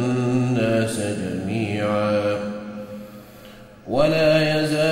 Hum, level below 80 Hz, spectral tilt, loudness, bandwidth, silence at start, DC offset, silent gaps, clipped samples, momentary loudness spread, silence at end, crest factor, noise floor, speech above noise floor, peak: none; -50 dBFS; -6 dB/octave; -21 LUFS; 16 kHz; 0 s; under 0.1%; none; under 0.1%; 19 LU; 0 s; 16 dB; -43 dBFS; 24 dB; -6 dBFS